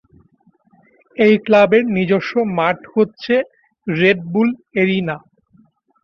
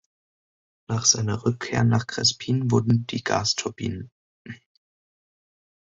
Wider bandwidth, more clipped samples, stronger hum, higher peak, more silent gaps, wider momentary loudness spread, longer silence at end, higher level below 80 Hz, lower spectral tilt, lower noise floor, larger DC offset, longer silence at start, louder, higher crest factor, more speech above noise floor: second, 6.8 kHz vs 8 kHz; neither; neither; about the same, -2 dBFS vs -4 dBFS; second, none vs 4.12-4.45 s; about the same, 13 LU vs 14 LU; second, 0.85 s vs 1.4 s; about the same, -58 dBFS vs -54 dBFS; first, -8 dB/octave vs -4 dB/octave; second, -56 dBFS vs under -90 dBFS; neither; first, 1.2 s vs 0.9 s; first, -16 LUFS vs -23 LUFS; second, 16 dB vs 22 dB; second, 41 dB vs over 67 dB